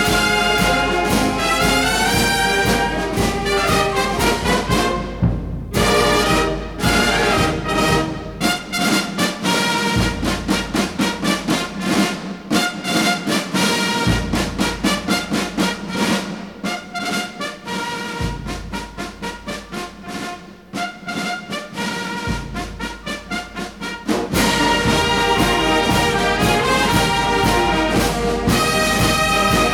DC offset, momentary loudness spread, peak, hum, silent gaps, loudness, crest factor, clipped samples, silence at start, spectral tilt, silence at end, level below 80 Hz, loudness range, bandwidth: 0.1%; 12 LU; -4 dBFS; none; none; -18 LUFS; 16 dB; under 0.1%; 0 s; -4 dB/octave; 0 s; -32 dBFS; 10 LU; 19.5 kHz